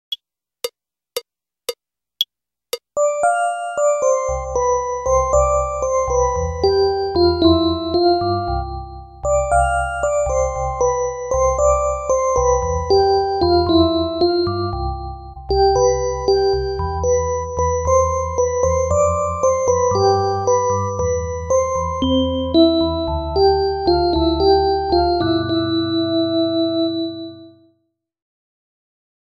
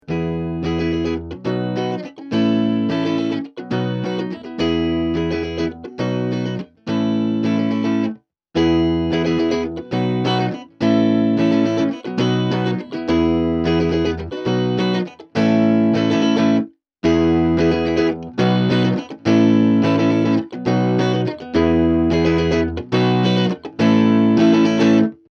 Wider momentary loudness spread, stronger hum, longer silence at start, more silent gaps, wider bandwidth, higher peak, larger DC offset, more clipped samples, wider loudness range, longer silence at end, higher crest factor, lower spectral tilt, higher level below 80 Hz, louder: about the same, 11 LU vs 9 LU; neither; about the same, 0.1 s vs 0.1 s; neither; first, 15 kHz vs 6.8 kHz; about the same, -2 dBFS vs -4 dBFS; neither; neither; about the same, 4 LU vs 5 LU; first, 1.75 s vs 0.15 s; about the same, 16 dB vs 14 dB; second, -5 dB/octave vs -7.5 dB/octave; first, -32 dBFS vs -42 dBFS; about the same, -18 LUFS vs -18 LUFS